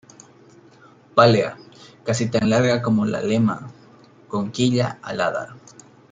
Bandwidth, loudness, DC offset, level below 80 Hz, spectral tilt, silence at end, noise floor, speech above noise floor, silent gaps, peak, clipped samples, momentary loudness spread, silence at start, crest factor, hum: 9.4 kHz; -20 LUFS; under 0.1%; -58 dBFS; -6 dB/octave; 0.55 s; -50 dBFS; 30 dB; none; -2 dBFS; under 0.1%; 16 LU; 1.15 s; 20 dB; none